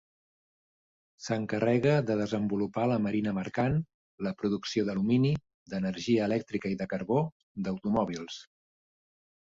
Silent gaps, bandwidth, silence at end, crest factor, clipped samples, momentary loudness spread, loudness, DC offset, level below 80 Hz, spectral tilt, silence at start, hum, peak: 3.94-4.18 s, 5.54-5.66 s, 7.32-7.55 s; 7.8 kHz; 1.1 s; 18 dB; under 0.1%; 11 LU; -30 LUFS; under 0.1%; -60 dBFS; -7 dB/octave; 1.2 s; none; -14 dBFS